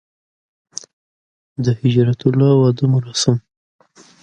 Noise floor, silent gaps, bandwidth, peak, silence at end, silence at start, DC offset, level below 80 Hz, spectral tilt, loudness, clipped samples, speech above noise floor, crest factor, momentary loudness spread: under -90 dBFS; none; 9.8 kHz; 0 dBFS; 0.85 s; 1.6 s; under 0.1%; -54 dBFS; -6.5 dB/octave; -16 LUFS; under 0.1%; over 75 dB; 18 dB; 19 LU